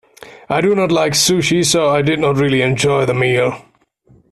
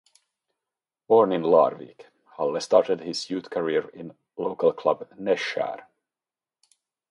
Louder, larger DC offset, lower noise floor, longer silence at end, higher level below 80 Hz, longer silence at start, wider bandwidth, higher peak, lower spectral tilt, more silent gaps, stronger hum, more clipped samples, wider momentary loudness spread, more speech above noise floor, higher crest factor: first, -14 LUFS vs -24 LUFS; neither; second, -51 dBFS vs under -90 dBFS; second, 0.7 s vs 1.35 s; first, -48 dBFS vs -74 dBFS; second, 0.25 s vs 1.1 s; first, 14.5 kHz vs 11.5 kHz; about the same, -2 dBFS vs -4 dBFS; about the same, -4 dB/octave vs -5 dB/octave; neither; neither; neither; second, 4 LU vs 16 LU; second, 37 dB vs over 66 dB; second, 14 dB vs 22 dB